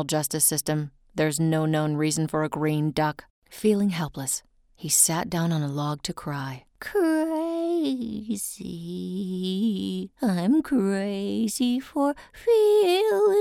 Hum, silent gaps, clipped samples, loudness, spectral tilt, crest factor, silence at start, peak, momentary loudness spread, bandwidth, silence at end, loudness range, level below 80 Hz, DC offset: none; 3.30-3.42 s; under 0.1%; -25 LUFS; -4.5 dB/octave; 18 dB; 0 s; -6 dBFS; 11 LU; 18.5 kHz; 0 s; 4 LU; -58 dBFS; under 0.1%